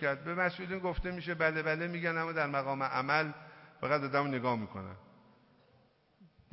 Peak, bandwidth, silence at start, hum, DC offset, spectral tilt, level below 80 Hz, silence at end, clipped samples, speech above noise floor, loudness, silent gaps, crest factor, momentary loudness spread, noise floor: -14 dBFS; 5.8 kHz; 0 s; none; under 0.1%; -9.5 dB/octave; -54 dBFS; 0.25 s; under 0.1%; 34 dB; -34 LUFS; none; 20 dB; 13 LU; -68 dBFS